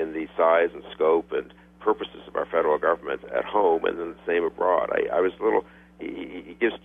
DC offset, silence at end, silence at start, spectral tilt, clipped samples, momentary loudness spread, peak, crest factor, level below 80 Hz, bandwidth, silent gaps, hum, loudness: under 0.1%; 0.05 s; 0 s; -7 dB/octave; under 0.1%; 12 LU; -8 dBFS; 16 dB; -58 dBFS; 3.8 kHz; none; none; -25 LUFS